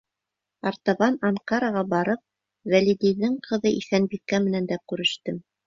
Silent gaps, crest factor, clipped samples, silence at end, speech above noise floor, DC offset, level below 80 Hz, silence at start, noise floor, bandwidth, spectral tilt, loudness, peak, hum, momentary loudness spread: none; 18 dB; under 0.1%; 0.25 s; 62 dB; under 0.1%; -64 dBFS; 0.65 s; -85 dBFS; 7.6 kHz; -5.5 dB/octave; -24 LUFS; -6 dBFS; none; 9 LU